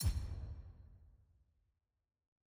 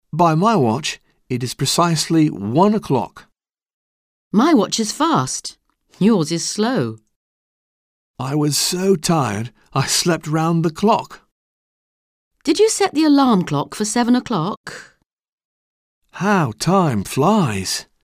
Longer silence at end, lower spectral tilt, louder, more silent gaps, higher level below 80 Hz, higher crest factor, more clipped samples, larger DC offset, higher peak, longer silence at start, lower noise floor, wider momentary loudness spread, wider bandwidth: first, 1.3 s vs 0.2 s; about the same, -5 dB/octave vs -5 dB/octave; second, -46 LUFS vs -18 LUFS; second, none vs 3.73-4.31 s, 7.16-8.14 s, 11.32-12.31 s, 14.57-14.64 s, 15.06-15.17 s, 15.29-15.38 s, 15.45-16.02 s; first, -48 dBFS vs -54 dBFS; about the same, 20 dB vs 16 dB; neither; neither; second, -26 dBFS vs -2 dBFS; second, 0 s vs 0.15 s; second, -83 dBFS vs under -90 dBFS; first, 22 LU vs 11 LU; about the same, 16.5 kHz vs 16 kHz